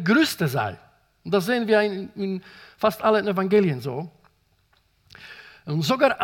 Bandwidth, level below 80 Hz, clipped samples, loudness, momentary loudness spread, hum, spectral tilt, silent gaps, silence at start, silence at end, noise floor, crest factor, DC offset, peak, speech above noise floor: 18 kHz; -64 dBFS; under 0.1%; -23 LUFS; 20 LU; none; -5.5 dB/octave; none; 0 s; 0 s; -64 dBFS; 18 dB; under 0.1%; -6 dBFS; 42 dB